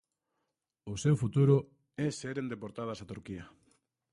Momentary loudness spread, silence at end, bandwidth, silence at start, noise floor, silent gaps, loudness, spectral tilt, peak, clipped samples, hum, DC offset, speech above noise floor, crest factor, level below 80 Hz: 19 LU; 0.65 s; 11 kHz; 0.85 s; -85 dBFS; none; -32 LUFS; -7 dB/octave; -14 dBFS; under 0.1%; none; under 0.1%; 53 dB; 20 dB; -62 dBFS